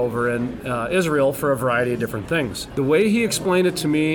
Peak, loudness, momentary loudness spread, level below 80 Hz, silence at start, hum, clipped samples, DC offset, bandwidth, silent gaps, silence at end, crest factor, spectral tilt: -8 dBFS; -21 LUFS; 7 LU; -48 dBFS; 0 s; none; under 0.1%; under 0.1%; 19.5 kHz; none; 0 s; 12 dB; -5 dB/octave